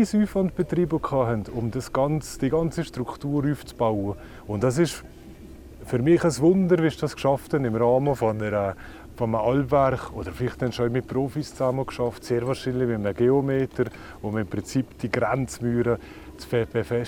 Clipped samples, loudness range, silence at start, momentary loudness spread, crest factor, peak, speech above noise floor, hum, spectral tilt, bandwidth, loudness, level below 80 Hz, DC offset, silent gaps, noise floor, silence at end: under 0.1%; 4 LU; 0 s; 10 LU; 16 dB; -8 dBFS; 19 dB; none; -7 dB/octave; 17.5 kHz; -25 LUFS; -46 dBFS; under 0.1%; none; -43 dBFS; 0 s